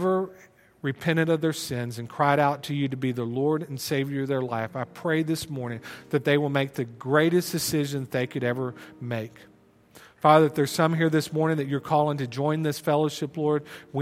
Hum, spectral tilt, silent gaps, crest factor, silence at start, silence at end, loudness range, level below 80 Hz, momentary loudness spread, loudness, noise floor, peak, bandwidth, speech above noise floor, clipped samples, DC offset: none; -6 dB/octave; none; 22 dB; 0 s; 0 s; 4 LU; -66 dBFS; 11 LU; -26 LUFS; -54 dBFS; -4 dBFS; 16.5 kHz; 29 dB; under 0.1%; under 0.1%